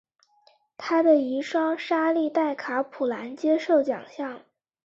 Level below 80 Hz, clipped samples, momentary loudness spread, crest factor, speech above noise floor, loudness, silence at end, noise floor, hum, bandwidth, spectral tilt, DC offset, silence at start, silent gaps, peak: -76 dBFS; under 0.1%; 14 LU; 16 dB; 38 dB; -25 LUFS; 0.5 s; -62 dBFS; none; 7.6 kHz; -5 dB/octave; under 0.1%; 0.8 s; none; -8 dBFS